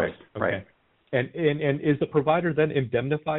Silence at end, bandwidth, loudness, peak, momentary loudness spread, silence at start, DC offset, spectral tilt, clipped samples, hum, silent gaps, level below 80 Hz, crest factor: 0 s; 4 kHz; -25 LUFS; -8 dBFS; 6 LU; 0 s; under 0.1%; -6 dB/octave; under 0.1%; none; none; -58 dBFS; 16 dB